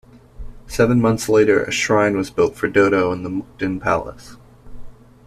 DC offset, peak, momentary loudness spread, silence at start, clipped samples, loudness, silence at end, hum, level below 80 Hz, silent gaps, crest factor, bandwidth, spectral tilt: under 0.1%; -2 dBFS; 10 LU; 0.4 s; under 0.1%; -18 LUFS; 0.35 s; none; -42 dBFS; none; 16 dB; 14 kHz; -5.5 dB/octave